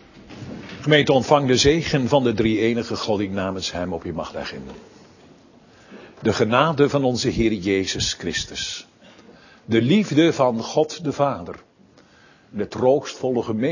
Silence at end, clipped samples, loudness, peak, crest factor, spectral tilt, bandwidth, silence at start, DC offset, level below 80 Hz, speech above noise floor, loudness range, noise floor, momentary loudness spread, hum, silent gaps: 0 s; under 0.1%; -21 LUFS; 0 dBFS; 20 dB; -5 dB/octave; 7.4 kHz; 0.15 s; under 0.1%; -46 dBFS; 33 dB; 7 LU; -53 dBFS; 15 LU; none; none